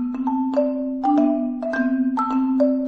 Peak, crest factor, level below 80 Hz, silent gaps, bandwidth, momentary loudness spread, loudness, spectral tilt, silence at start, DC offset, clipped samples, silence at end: -8 dBFS; 12 dB; -56 dBFS; none; 5.8 kHz; 5 LU; -21 LUFS; -7 dB/octave; 0 s; under 0.1%; under 0.1%; 0 s